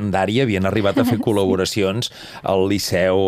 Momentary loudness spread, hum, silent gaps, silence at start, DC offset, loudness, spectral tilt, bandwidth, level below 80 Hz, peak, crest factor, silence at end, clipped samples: 5 LU; none; none; 0 s; under 0.1%; -19 LUFS; -5.5 dB/octave; 15.5 kHz; -52 dBFS; -4 dBFS; 14 dB; 0 s; under 0.1%